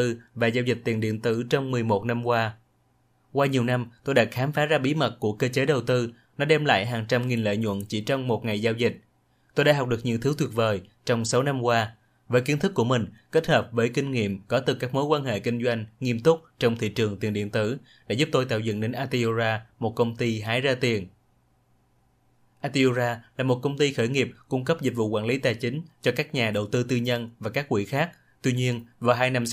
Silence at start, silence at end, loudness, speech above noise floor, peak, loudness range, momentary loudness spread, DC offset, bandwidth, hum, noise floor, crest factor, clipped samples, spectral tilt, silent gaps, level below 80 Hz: 0 s; 0 s; -25 LUFS; 41 dB; -4 dBFS; 3 LU; 6 LU; under 0.1%; 15.5 kHz; none; -65 dBFS; 22 dB; under 0.1%; -5.5 dB/octave; none; -62 dBFS